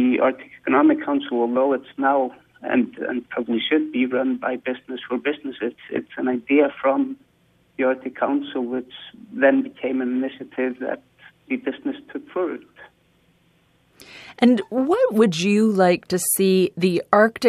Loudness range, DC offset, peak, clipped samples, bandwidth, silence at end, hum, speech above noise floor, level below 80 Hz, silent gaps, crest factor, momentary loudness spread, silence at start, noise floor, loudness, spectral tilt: 9 LU; under 0.1%; 0 dBFS; under 0.1%; 14.5 kHz; 0 s; none; 40 dB; -66 dBFS; none; 22 dB; 13 LU; 0 s; -61 dBFS; -21 LUFS; -5 dB/octave